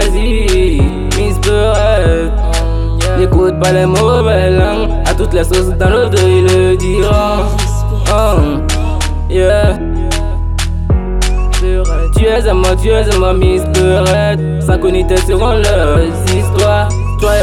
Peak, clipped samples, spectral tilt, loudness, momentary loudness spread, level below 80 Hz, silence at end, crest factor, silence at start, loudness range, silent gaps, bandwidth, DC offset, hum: 0 dBFS; under 0.1%; -5.5 dB/octave; -12 LUFS; 5 LU; -14 dBFS; 0 s; 10 dB; 0 s; 3 LU; none; 14 kHz; under 0.1%; none